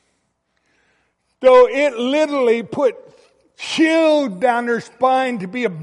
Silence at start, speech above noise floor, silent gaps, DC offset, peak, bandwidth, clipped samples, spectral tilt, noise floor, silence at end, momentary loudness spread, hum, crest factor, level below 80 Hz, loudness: 1.4 s; 52 dB; none; under 0.1%; -2 dBFS; 11 kHz; under 0.1%; -4.5 dB/octave; -68 dBFS; 0 s; 11 LU; none; 16 dB; -62 dBFS; -16 LUFS